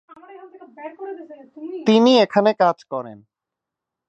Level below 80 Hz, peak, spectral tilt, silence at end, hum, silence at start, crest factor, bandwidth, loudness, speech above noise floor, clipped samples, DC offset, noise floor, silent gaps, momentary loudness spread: -78 dBFS; -2 dBFS; -5.5 dB/octave; 0.95 s; none; 0.35 s; 20 dB; 8 kHz; -17 LUFS; 66 dB; under 0.1%; under 0.1%; -85 dBFS; none; 23 LU